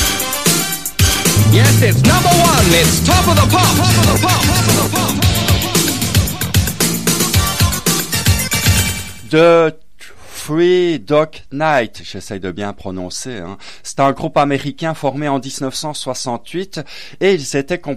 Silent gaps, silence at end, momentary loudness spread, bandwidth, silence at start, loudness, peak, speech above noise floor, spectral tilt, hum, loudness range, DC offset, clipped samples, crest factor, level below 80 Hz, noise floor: none; 0 s; 15 LU; 15.5 kHz; 0 s; -13 LUFS; 0 dBFS; 26 dB; -4 dB/octave; none; 9 LU; 2%; under 0.1%; 14 dB; -30 dBFS; -40 dBFS